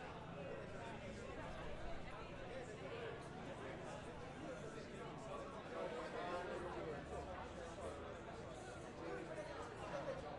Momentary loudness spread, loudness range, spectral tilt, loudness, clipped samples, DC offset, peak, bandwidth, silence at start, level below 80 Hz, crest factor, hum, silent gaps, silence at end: 5 LU; 2 LU; -5.5 dB/octave; -50 LUFS; under 0.1%; under 0.1%; -34 dBFS; 11.5 kHz; 0 s; -62 dBFS; 16 dB; none; none; 0 s